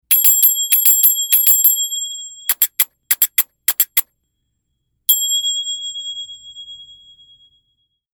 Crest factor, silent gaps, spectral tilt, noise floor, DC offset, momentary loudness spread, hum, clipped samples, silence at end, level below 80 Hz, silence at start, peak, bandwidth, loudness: 18 dB; none; 5.5 dB/octave; -71 dBFS; under 0.1%; 17 LU; none; under 0.1%; 1.3 s; -70 dBFS; 0.1 s; 0 dBFS; over 20 kHz; -13 LUFS